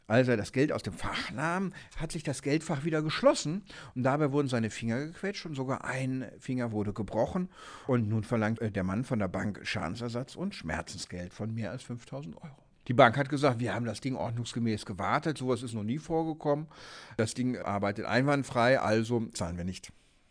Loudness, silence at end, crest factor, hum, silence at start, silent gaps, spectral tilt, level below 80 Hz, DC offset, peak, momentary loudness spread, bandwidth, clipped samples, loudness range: -31 LUFS; 0.4 s; 26 dB; none; 0.1 s; none; -6 dB/octave; -56 dBFS; under 0.1%; -6 dBFS; 13 LU; 11 kHz; under 0.1%; 4 LU